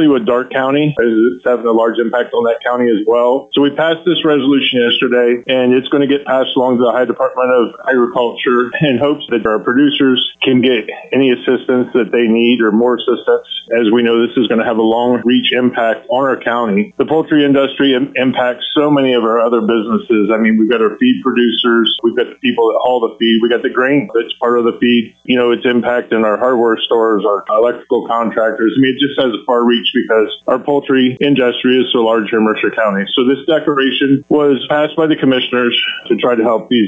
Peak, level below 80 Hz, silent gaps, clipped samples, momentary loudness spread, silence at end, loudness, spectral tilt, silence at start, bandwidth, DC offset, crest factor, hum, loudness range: -2 dBFS; -58 dBFS; none; under 0.1%; 4 LU; 0 s; -13 LUFS; -7.5 dB/octave; 0 s; 3.9 kHz; under 0.1%; 10 dB; none; 1 LU